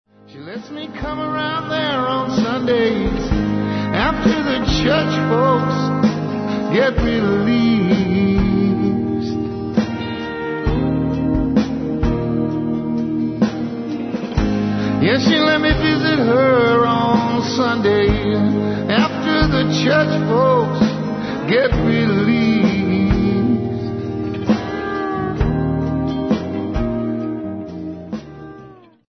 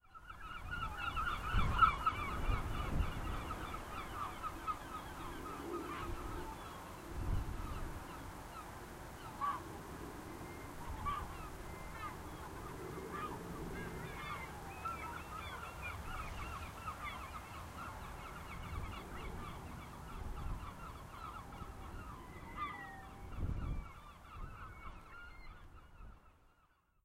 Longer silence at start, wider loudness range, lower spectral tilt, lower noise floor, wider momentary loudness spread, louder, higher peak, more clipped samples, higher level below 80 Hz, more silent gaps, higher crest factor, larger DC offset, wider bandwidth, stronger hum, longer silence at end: first, 0.3 s vs 0.05 s; second, 5 LU vs 11 LU; first, -7 dB/octave vs -5 dB/octave; second, -42 dBFS vs -73 dBFS; about the same, 9 LU vs 11 LU; first, -18 LUFS vs -44 LUFS; first, -2 dBFS vs -18 dBFS; neither; first, -32 dBFS vs -48 dBFS; neither; second, 14 dB vs 26 dB; neither; second, 6.4 kHz vs 16 kHz; neither; second, 0.35 s vs 0.55 s